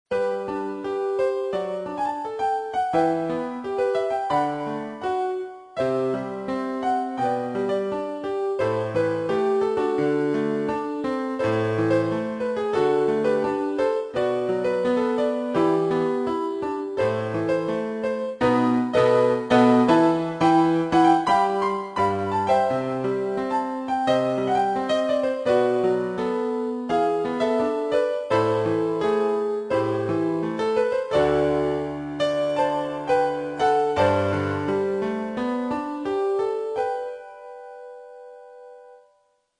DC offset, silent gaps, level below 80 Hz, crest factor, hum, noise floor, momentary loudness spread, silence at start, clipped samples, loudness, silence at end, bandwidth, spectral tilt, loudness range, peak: under 0.1%; none; -58 dBFS; 18 dB; none; -65 dBFS; 8 LU; 0.1 s; under 0.1%; -23 LUFS; 0.65 s; 10.5 kHz; -6.5 dB/octave; 6 LU; -4 dBFS